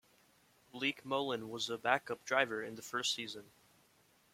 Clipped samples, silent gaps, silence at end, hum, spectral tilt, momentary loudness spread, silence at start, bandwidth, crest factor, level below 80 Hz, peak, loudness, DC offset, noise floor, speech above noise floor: under 0.1%; none; 0.9 s; none; -2.5 dB/octave; 9 LU; 0.75 s; 16.5 kHz; 26 dB; -80 dBFS; -14 dBFS; -37 LUFS; under 0.1%; -70 dBFS; 32 dB